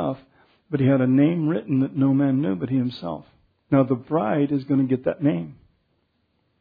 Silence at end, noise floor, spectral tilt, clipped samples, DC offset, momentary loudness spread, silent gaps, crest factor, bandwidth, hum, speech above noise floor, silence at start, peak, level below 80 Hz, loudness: 1.1 s; -69 dBFS; -11.5 dB/octave; under 0.1%; under 0.1%; 11 LU; none; 18 dB; 5 kHz; none; 48 dB; 0 s; -6 dBFS; -60 dBFS; -22 LUFS